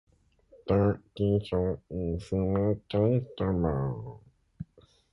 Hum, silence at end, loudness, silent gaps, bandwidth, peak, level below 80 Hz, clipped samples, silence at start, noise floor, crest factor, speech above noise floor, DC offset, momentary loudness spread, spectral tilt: none; 0.5 s; -29 LUFS; none; 10.5 kHz; -12 dBFS; -46 dBFS; under 0.1%; 0.65 s; -61 dBFS; 18 dB; 33 dB; under 0.1%; 19 LU; -9.5 dB/octave